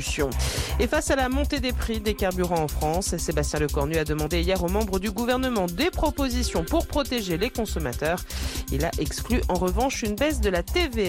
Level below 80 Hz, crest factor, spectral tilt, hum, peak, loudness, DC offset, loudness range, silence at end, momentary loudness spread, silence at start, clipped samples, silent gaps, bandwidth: -32 dBFS; 12 dB; -4.5 dB/octave; none; -12 dBFS; -25 LUFS; under 0.1%; 1 LU; 0 s; 3 LU; 0 s; under 0.1%; none; 17 kHz